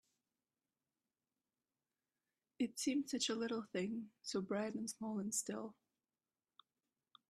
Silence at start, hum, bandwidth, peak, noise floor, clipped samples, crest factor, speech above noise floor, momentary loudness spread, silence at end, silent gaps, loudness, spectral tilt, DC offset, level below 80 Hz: 2.6 s; none; 13 kHz; -26 dBFS; under -90 dBFS; under 0.1%; 20 dB; over 48 dB; 7 LU; 1.6 s; none; -42 LUFS; -3.5 dB/octave; under 0.1%; -86 dBFS